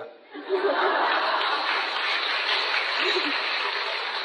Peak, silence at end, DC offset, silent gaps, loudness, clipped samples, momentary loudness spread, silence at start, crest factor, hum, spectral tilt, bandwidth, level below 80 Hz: -12 dBFS; 0 s; under 0.1%; none; -24 LUFS; under 0.1%; 4 LU; 0 s; 14 dB; none; -0.5 dB/octave; 10 kHz; under -90 dBFS